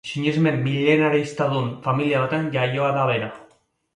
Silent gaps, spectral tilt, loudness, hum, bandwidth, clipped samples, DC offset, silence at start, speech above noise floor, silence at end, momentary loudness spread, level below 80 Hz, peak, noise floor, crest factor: none; -7 dB/octave; -21 LUFS; none; 11 kHz; under 0.1%; under 0.1%; 0.05 s; 37 dB; 0.55 s; 6 LU; -62 dBFS; -4 dBFS; -58 dBFS; 18 dB